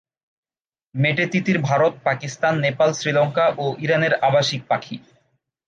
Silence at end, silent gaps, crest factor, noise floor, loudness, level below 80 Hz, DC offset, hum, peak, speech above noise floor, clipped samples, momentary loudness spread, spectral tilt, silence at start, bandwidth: 0.7 s; none; 16 dB; under -90 dBFS; -20 LUFS; -66 dBFS; under 0.1%; none; -4 dBFS; over 70 dB; under 0.1%; 7 LU; -5.5 dB/octave; 0.95 s; 9.2 kHz